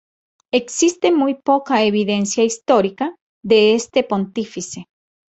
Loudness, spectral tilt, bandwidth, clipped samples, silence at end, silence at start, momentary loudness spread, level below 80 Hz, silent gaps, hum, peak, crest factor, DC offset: -17 LUFS; -4 dB/octave; 8.2 kHz; under 0.1%; 0.55 s; 0.55 s; 12 LU; -62 dBFS; 3.21-3.41 s; none; -2 dBFS; 16 dB; under 0.1%